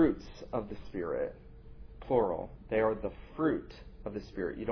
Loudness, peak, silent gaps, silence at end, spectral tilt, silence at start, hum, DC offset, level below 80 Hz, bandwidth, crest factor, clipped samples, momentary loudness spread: -35 LUFS; -14 dBFS; none; 0 s; -6.5 dB/octave; 0 s; none; under 0.1%; -50 dBFS; 5.4 kHz; 20 dB; under 0.1%; 21 LU